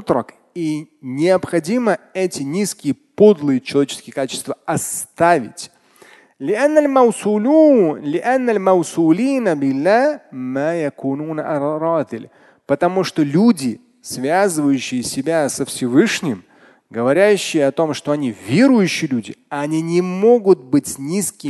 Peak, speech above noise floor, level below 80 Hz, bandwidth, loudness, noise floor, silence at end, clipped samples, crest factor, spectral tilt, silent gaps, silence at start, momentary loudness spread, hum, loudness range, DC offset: 0 dBFS; 31 dB; -60 dBFS; 12.5 kHz; -17 LUFS; -48 dBFS; 0 s; under 0.1%; 16 dB; -5 dB/octave; none; 0 s; 12 LU; none; 4 LU; under 0.1%